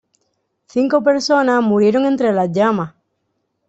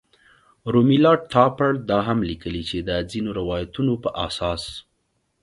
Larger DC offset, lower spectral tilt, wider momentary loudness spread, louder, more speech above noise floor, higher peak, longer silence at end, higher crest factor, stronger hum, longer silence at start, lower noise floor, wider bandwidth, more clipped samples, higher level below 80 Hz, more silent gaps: neither; about the same, -6 dB/octave vs -7 dB/octave; second, 8 LU vs 12 LU; first, -16 LUFS vs -21 LUFS; first, 56 dB vs 50 dB; about the same, -2 dBFS vs 0 dBFS; first, 0.8 s vs 0.65 s; second, 14 dB vs 22 dB; neither; about the same, 0.75 s vs 0.65 s; about the same, -70 dBFS vs -71 dBFS; second, 8.2 kHz vs 11.5 kHz; neither; second, -60 dBFS vs -44 dBFS; neither